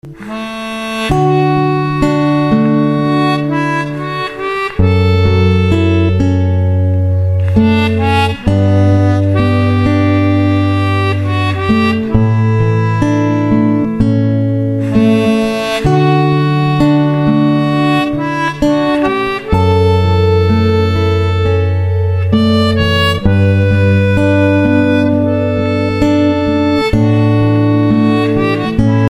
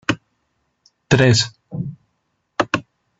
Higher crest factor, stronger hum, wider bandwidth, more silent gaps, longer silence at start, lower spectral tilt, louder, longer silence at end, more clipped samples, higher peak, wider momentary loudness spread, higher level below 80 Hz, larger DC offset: second, 10 dB vs 20 dB; neither; first, 11.5 kHz vs 8 kHz; neither; about the same, 0.05 s vs 0.1 s; first, -8 dB/octave vs -5 dB/octave; first, -12 LUFS vs -19 LUFS; second, 0.05 s vs 0.4 s; neither; about the same, 0 dBFS vs -2 dBFS; second, 4 LU vs 16 LU; first, -30 dBFS vs -50 dBFS; first, 0.4% vs under 0.1%